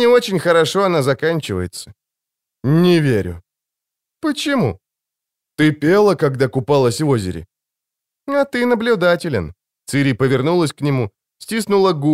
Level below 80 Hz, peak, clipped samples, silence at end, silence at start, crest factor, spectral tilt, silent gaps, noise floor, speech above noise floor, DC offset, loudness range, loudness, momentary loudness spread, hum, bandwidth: -50 dBFS; -2 dBFS; under 0.1%; 0 s; 0 s; 14 dB; -6 dB/octave; none; -84 dBFS; 68 dB; under 0.1%; 2 LU; -17 LUFS; 15 LU; none; 16 kHz